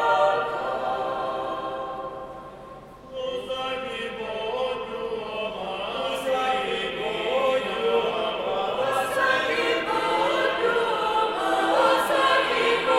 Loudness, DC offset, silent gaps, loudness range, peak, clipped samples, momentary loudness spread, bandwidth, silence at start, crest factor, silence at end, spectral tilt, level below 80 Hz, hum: -25 LUFS; under 0.1%; none; 9 LU; -6 dBFS; under 0.1%; 11 LU; 16 kHz; 0 s; 18 dB; 0 s; -3 dB/octave; -56 dBFS; none